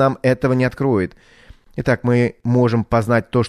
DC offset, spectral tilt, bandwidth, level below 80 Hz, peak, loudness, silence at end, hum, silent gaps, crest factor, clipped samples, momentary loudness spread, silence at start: under 0.1%; -8 dB/octave; 11.5 kHz; -42 dBFS; -4 dBFS; -18 LUFS; 0 s; none; none; 14 dB; under 0.1%; 6 LU; 0 s